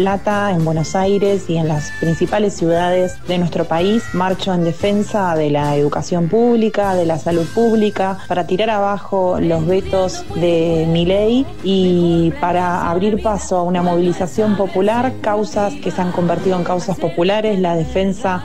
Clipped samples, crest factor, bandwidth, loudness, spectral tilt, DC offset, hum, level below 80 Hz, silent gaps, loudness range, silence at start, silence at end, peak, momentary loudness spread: under 0.1%; 10 dB; 12.5 kHz; -17 LUFS; -6.5 dB/octave; 4%; none; -38 dBFS; none; 2 LU; 0 s; 0 s; -4 dBFS; 4 LU